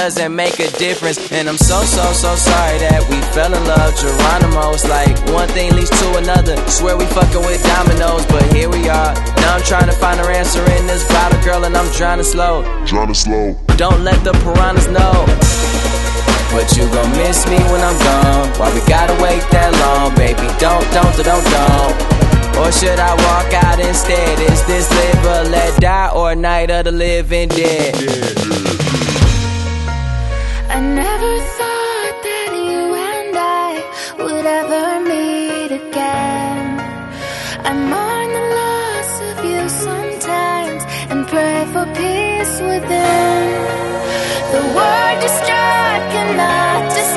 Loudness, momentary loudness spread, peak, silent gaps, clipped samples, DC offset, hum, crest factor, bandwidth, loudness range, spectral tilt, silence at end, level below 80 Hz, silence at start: -14 LUFS; 7 LU; 0 dBFS; none; under 0.1%; under 0.1%; none; 12 dB; 12.5 kHz; 6 LU; -4.5 dB/octave; 0 s; -18 dBFS; 0 s